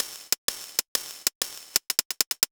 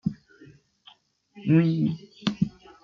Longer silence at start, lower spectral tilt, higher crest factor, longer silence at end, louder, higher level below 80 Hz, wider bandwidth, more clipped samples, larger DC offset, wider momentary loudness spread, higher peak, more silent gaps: about the same, 0 s vs 0.05 s; second, 2 dB/octave vs -8 dB/octave; first, 28 dB vs 18 dB; second, 0.05 s vs 0.35 s; about the same, -27 LUFS vs -26 LUFS; second, -68 dBFS vs -60 dBFS; first, over 20 kHz vs 6.8 kHz; neither; neither; second, 5 LU vs 13 LU; first, -2 dBFS vs -8 dBFS; first, 0.38-0.48 s, 0.88-0.95 s, 1.35-1.41 s, 2.05-2.10 s, 2.27-2.31 s vs none